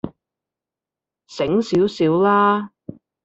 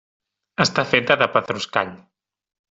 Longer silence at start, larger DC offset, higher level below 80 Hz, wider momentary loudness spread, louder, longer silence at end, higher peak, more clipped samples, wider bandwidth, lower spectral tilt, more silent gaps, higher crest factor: second, 0.05 s vs 0.6 s; neither; about the same, -58 dBFS vs -58 dBFS; first, 19 LU vs 10 LU; about the same, -18 LUFS vs -20 LUFS; second, 0.55 s vs 0.8 s; second, -4 dBFS vs 0 dBFS; neither; about the same, 8 kHz vs 8 kHz; first, -7 dB/octave vs -4 dB/octave; neither; second, 16 dB vs 22 dB